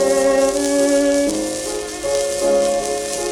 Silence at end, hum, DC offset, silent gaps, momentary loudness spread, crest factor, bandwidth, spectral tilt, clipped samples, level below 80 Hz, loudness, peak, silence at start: 0 s; none; under 0.1%; none; 7 LU; 16 dB; 16 kHz; -2.5 dB/octave; under 0.1%; -44 dBFS; -18 LUFS; -2 dBFS; 0 s